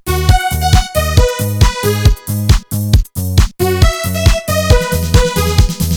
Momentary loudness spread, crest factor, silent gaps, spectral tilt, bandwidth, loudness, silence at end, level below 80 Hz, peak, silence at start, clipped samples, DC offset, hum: 2 LU; 12 dB; none; -5 dB/octave; 19 kHz; -13 LUFS; 0 s; -16 dBFS; 0 dBFS; 0.05 s; 0.6%; under 0.1%; none